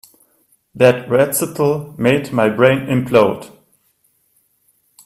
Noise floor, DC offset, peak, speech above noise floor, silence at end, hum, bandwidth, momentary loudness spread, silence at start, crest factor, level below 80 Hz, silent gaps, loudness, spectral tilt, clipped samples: -61 dBFS; under 0.1%; 0 dBFS; 47 dB; 1.6 s; none; 16 kHz; 5 LU; 0.75 s; 18 dB; -54 dBFS; none; -15 LUFS; -5.5 dB/octave; under 0.1%